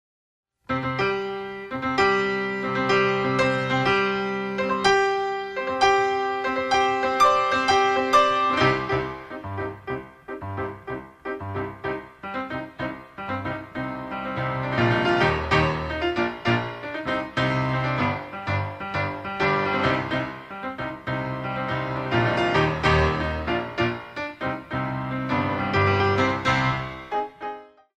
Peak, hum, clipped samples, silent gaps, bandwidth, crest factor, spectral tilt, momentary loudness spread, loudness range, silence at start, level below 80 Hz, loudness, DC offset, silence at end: -4 dBFS; none; under 0.1%; none; 12.5 kHz; 20 dB; -5.5 dB/octave; 13 LU; 10 LU; 0.7 s; -44 dBFS; -24 LUFS; under 0.1%; 0.35 s